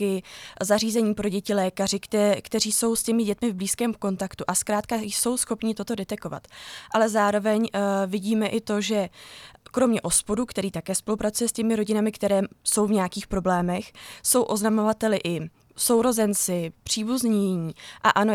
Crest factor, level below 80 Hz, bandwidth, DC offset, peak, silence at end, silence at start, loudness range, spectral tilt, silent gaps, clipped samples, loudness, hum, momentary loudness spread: 20 dB; -54 dBFS; 19 kHz; under 0.1%; -4 dBFS; 0 s; 0 s; 2 LU; -4 dB/octave; none; under 0.1%; -24 LUFS; none; 10 LU